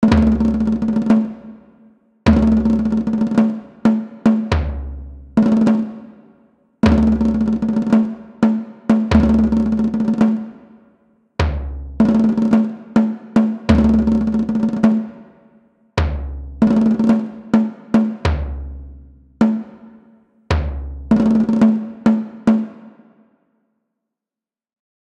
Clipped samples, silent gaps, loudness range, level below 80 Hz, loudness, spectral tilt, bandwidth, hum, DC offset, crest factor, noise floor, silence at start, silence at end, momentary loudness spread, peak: under 0.1%; none; 4 LU; -30 dBFS; -17 LUFS; -8.5 dB/octave; 7.8 kHz; none; under 0.1%; 18 dB; -90 dBFS; 0 s; 2.25 s; 13 LU; 0 dBFS